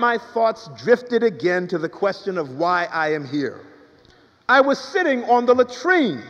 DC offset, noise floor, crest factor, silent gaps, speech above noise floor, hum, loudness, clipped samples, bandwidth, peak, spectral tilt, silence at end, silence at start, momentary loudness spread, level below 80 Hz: under 0.1%; -53 dBFS; 18 dB; none; 34 dB; none; -20 LUFS; under 0.1%; 7.8 kHz; -2 dBFS; -5.5 dB/octave; 0 s; 0 s; 10 LU; -68 dBFS